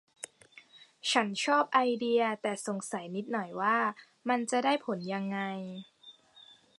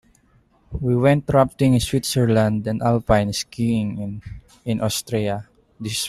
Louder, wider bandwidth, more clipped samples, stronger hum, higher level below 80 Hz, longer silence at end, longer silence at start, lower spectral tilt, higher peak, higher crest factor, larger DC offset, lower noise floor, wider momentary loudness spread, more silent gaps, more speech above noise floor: second, -31 LUFS vs -20 LUFS; second, 11.5 kHz vs 15 kHz; neither; neither; second, -86 dBFS vs -42 dBFS; first, 0.4 s vs 0 s; second, 0.2 s vs 0.7 s; second, -3.5 dB/octave vs -6 dB/octave; second, -12 dBFS vs -4 dBFS; about the same, 20 dB vs 18 dB; neither; about the same, -58 dBFS vs -58 dBFS; about the same, 15 LU vs 14 LU; neither; second, 28 dB vs 38 dB